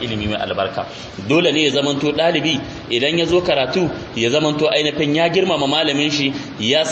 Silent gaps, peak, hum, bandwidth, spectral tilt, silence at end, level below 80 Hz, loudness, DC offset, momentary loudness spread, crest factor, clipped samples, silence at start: none; -2 dBFS; none; 8.4 kHz; -4.5 dB/octave; 0 s; -46 dBFS; -17 LUFS; under 0.1%; 6 LU; 16 dB; under 0.1%; 0 s